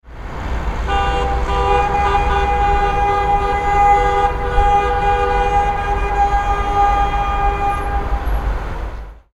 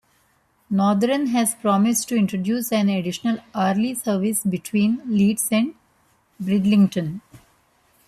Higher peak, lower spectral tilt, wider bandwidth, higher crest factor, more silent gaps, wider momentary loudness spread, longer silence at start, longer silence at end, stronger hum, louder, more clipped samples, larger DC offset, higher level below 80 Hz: first, 0 dBFS vs -8 dBFS; about the same, -6 dB/octave vs -5 dB/octave; second, 12 kHz vs 14.5 kHz; about the same, 16 dB vs 14 dB; neither; first, 10 LU vs 7 LU; second, 0.05 s vs 0.7 s; second, 0.15 s vs 0.7 s; neither; first, -17 LUFS vs -21 LUFS; neither; neither; first, -22 dBFS vs -62 dBFS